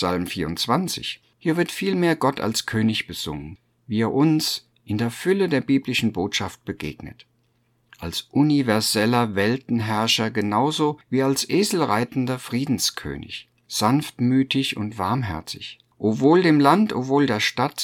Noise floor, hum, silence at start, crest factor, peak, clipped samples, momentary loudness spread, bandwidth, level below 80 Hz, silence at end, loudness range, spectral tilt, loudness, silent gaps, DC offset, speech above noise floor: -66 dBFS; none; 0 s; 20 dB; -2 dBFS; under 0.1%; 12 LU; 19 kHz; -54 dBFS; 0 s; 4 LU; -5 dB/octave; -22 LUFS; none; under 0.1%; 44 dB